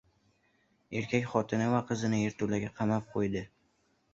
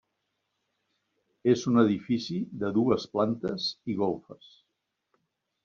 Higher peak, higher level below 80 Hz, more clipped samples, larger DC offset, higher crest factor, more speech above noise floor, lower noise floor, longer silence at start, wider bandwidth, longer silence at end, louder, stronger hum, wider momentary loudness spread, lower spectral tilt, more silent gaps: about the same, -12 dBFS vs -10 dBFS; first, -62 dBFS vs -68 dBFS; neither; neither; about the same, 20 dB vs 20 dB; second, 41 dB vs 54 dB; second, -72 dBFS vs -82 dBFS; second, 0.9 s vs 1.45 s; about the same, 7.8 kHz vs 7.2 kHz; second, 0.65 s vs 1.3 s; second, -32 LUFS vs -28 LUFS; neither; about the same, 8 LU vs 8 LU; about the same, -6.5 dB/octave vs -6 dB/octave; neither